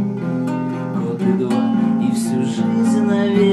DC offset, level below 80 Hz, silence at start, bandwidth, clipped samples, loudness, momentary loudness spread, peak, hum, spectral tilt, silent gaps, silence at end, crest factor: under 0.1%; -62 dBFS; 0 s; 12.5 kHz; under 0.1%; -18 LUFS; 6 LU; -4 dBFS; none; -7 dB/octave; none; 0 s; 14 dB